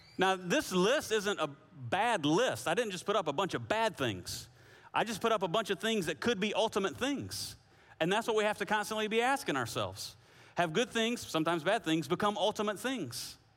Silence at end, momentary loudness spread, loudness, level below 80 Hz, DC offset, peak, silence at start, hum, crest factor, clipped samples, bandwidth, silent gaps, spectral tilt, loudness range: 0.2 s; 9 LU; -33 LUFS; -68 dBFS; under 0.1%; -16 dBFS; 0.2 s; none; 16 dB; under 0.1%; 16.5 kHz; none; -4 dB/octave; 2 LU